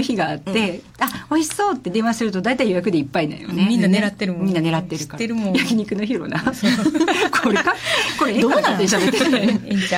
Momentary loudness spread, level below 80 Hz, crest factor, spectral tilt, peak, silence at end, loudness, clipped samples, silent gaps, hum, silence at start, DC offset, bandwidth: 6 LU; -54 dBFS; 14 dB; -4.5 dB/octave; -6 dBFS; 0 s; -19 LUFS; under 0.1%; none; none; 0 s; under 0.1%; 16.5 kHz